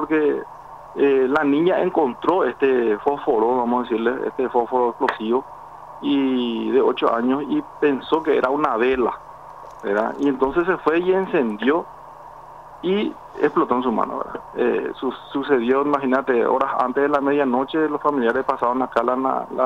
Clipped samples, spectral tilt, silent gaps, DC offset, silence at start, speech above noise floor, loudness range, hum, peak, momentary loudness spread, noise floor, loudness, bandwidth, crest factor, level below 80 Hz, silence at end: under 0.1%; -7 dB/octave; none; 0.1%; 0 s; 21 dB; 3 LU; none; -6 dBFS; 11 LU; -40 dBFS; -20 LUFS; 7.2 kHz; 14 dB; -56 dBFS; 0 s